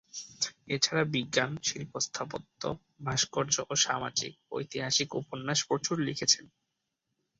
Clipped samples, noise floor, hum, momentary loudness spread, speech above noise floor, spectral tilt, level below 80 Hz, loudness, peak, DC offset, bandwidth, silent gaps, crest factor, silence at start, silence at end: under 0.1%; -83 dBFS; none; 11 LU; 51 dB; -2.5 dB/octave; -66 dBFS; -30 LUFS; -10 dBFS; under 0.1%; 8.4 kHz; none; 24 dB; 0.15 s; 0.9 s